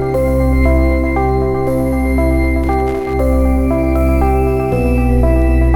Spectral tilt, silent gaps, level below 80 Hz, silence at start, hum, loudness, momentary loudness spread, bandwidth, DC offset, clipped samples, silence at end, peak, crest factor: -9 dB/octave; none; -16 dBFS; 0 s; none; -14 LUFS; 3 LU; 13 kHz; under 0.1%; under 0.1%; 0 s; 0 dBFS; 12 dB